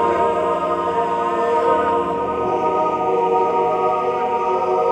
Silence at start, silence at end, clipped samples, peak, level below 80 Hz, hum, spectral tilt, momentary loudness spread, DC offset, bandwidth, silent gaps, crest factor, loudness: 0 s; 0 s; under 0.1%; -6 dBFS; -50 dBFS; none; -6.5 dB/octave; 3 LU; under 0.1%; 9.4 kHz; none; 12 dB; -19 LUFS